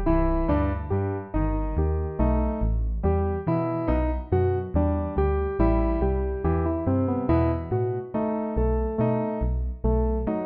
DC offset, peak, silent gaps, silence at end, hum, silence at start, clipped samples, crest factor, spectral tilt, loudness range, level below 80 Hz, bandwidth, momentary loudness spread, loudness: under 0.1%; -10 dBFS; none; 0 s; none; 0 s; under 0.1%; 14 dB; -10 dB/octave; 1 LU; -28 dBFS; 4.3 kHz; 4 LU; -26 LUFS